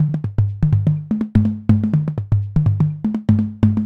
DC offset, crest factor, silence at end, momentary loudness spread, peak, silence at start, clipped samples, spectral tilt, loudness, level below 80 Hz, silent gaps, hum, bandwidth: under 0.1%; 16 dB; 0 s; 4 LU; 0 dBFS; 0 s; under 0.1%; -11 dB/octave; -18 LUFS; -36 dBFS; none; none; 4.1 kHz